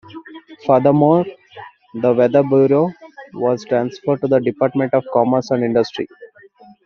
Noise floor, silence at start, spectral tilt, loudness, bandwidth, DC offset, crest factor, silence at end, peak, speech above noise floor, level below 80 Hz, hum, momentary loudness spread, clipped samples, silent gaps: -46 dBFS; 0.15 s; -7 dB/octave; -16 LUFS; 6.8 kHz; under 0.1%; 16 dB; 0.6 s; -2 dBFS; 30 dB; -60 dBFS; none; 15 LU; under 0.1%; none